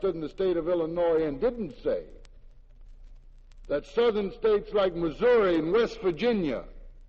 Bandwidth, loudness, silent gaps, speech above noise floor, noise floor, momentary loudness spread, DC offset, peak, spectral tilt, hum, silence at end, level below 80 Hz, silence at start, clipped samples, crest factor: 7.2 kHz; -27 LUFS; none; 23 dB; -50 dBFS; 9 LU; under 0.1%; -14 dBFS; -7 dB/octave; none; 0.05 s; -48 dBFS; 0 s; under 0.1%; 14 dB